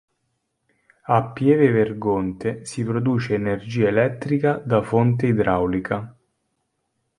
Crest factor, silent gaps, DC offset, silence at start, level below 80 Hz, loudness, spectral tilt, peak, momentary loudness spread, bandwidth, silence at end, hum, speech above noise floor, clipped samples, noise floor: 18 dB; none; under 0.1%; 1.1 s; -50 dBFS; -21 LUFS; -8 dB/octave; -2 dBFS; 10 LU; 11 kHz; 1.05 s; none; 54 dB; under 0.1%; -74 dBFS